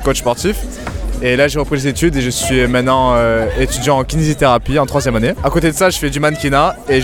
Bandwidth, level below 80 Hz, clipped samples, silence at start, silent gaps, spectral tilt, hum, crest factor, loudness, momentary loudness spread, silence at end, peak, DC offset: 19 kHz; -26 dBFS; under 0.1%; 0 s; none; -5 dB/octave; none; 14 dB; -14 LUFS; 5 LU; 0 s; 0 dBFS; under 0.1%